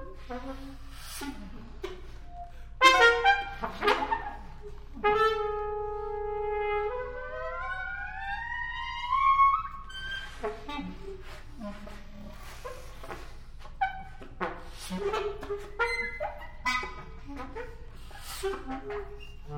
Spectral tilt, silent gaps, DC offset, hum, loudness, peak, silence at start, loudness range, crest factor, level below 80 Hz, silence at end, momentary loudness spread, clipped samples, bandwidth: -3 dB/octave; none; under 0.1%; none; -29 LUFS; -4 dBFS; 0 s; 15 LU; 28 dB; -44 dBFS; 0 s; 22 LU; under 0.1%; 17 kHz